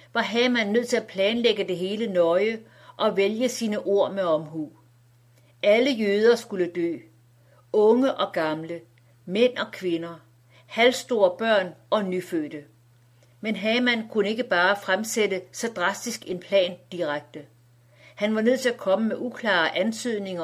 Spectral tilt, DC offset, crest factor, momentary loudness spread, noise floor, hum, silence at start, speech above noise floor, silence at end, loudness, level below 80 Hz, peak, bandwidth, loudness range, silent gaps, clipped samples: -4 dB/octave; under 0.1%; 18 dB; 11 LU; -57 dBFS; none; 0.15 s; 34 dB; 0 s; -24 LUFS; -74 dBFS; -6 dBFS; 15.5 kHz; 3 LU; none; under 0.1%